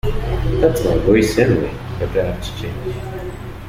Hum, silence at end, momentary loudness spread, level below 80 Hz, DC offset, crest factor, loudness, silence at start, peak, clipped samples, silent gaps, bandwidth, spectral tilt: none; 0 s; 13 LU; -28 dBFS; under 0.1%; 16 dB; -18 LUFS; 0.05 s; -2 dBFS; under 0.1%; none; 16 kHz; -6.5 dB/octave